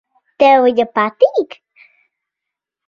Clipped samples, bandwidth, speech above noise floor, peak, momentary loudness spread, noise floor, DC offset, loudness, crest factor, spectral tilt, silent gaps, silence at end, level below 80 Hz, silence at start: under 0.1%; 7 kHz; 70 dB; 0 dBFS; 10 LU; -82 dBFS; under 0.1%; -13 LUFS; 16 dB; -5.5 dB/octave; none; 1.45 s; -62 dBFS; 0.4 s